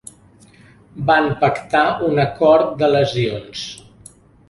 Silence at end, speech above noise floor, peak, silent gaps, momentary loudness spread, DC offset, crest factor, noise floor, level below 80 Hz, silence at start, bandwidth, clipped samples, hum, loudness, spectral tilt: 0.75 s; 32 dB; -2 dBFS; none; 15 LU; under 0.1%; 16 dB; -48 dBFS; -50 dBFS; 0.95 s; 11.5 kHz; under 0.1%; none; -17 LUFS; -6 dB/octave